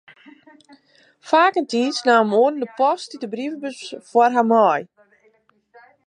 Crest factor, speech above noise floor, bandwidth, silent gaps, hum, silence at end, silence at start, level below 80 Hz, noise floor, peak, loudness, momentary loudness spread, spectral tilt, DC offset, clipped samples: 18 dB; 42 dB; 10.5 kHz; none; none; 1.25 s; 1.25 s; -78 dBFS; -60 dBFS; -2 dBFS; -19 LUFS; 13 LU; -4.5 dB/octave; under 0.1%; under 0.1%